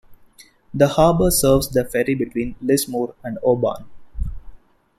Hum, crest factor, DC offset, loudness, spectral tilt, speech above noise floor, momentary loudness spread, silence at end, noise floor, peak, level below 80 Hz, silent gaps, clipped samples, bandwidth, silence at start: none; 18 dB; under 0.1%; -19 LUFS; -5 dB/octave; 32 dB; 17 LU; 0.4 s; -50 dBFS; -2 dBFS; -34 dBFS; none; under 0.1%; 16.5 kHz; 0.1 s